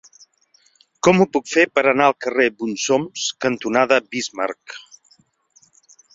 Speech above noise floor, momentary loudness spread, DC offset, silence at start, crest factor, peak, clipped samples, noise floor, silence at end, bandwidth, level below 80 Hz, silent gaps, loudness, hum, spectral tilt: 41 dB; 11 LU; under 0.1%; 1.05 s; 20 dB; 0 dBFS; under 0.1%; -59 dBFS; 1.35 s; 7.8 kHz; -62 dBFS; none; -18 LUFS; none; -4 dB/octave